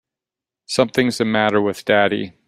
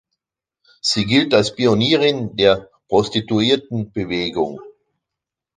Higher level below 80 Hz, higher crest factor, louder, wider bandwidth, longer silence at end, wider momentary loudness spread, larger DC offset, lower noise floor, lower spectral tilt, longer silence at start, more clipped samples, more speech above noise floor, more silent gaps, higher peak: second, -58 dBFS vs -50 dBFS; about the same, 18 dB vs 18 dB; about the same, -18 LUFS vs -18 LUFS; first, 15.5 kHz vs 9.8 kHz; second, 0.2 s vs 0.9 s; second, 3 LU vs 9 LU; neither; first, -88 dBFS vs -84 dBFS; about the same, -4.5 dB/octave vs -5 dB/octave; second, 0.7 s vs 0.85 s; neither; about the same, 70 dB vs 67 dB; neither; about the same, -2 dBFS vs -2 dBFS